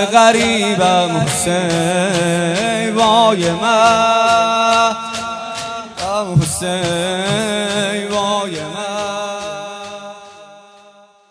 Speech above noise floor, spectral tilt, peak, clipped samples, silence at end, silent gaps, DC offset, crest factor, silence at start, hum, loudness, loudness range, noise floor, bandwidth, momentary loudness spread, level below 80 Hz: 32 dB; -4 dB/octave; 0 dBFS; under 0.1%; 0.7 s; none; under 0.1%; 16 dB; 0 s; none; -15 LUFS; 8 LU; -46 dBFS; 11 kHz; 13 LU; -48 dBFS